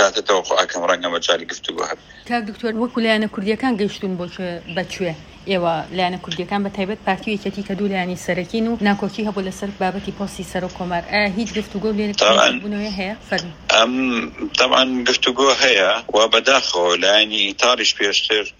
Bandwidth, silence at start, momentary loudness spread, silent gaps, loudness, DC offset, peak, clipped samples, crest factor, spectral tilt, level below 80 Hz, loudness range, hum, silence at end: 15.5 kHz; 0 s; 12 LU; none; -18 LUFS; under 0.1%; 0 dBFS; under 0.1%; 18 dB; -3 dB/octave; -48 dBFS; 8 LU; none; 0.1 s